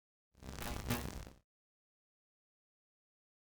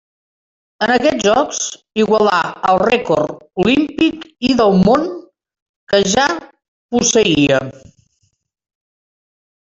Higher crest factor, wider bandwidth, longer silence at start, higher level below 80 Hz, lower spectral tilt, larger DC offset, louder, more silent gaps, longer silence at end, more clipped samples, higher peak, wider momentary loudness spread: first, 30 dB vs 14 dB; first, over 20 kHz vs 7.8 kHz; second, 0.35 s vs 0.8 s; second, -54 dBFS vs -48 dBFS; about the same, -4.5 dB/octave vs -4 dB/octave; neither; second, -44 LUFS vs -15 LUFS; second, none vs 5.62-5.87 s, 6.68-6.89 s; first, 2.1 s vs 1.85 s; neither; second, -18 dBFS vs -2 dBFS; first, 16 LU vs 9 LU